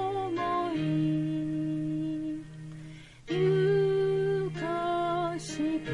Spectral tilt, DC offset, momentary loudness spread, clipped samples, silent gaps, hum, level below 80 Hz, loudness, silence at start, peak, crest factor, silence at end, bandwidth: -7 dB/octave; under 0.1%; 16 LU; under 0.1%; none; none; -58 dBFS; -30 LUFS; 0 s; -16 dBFS; 12 dB; 0 s; 11 kHz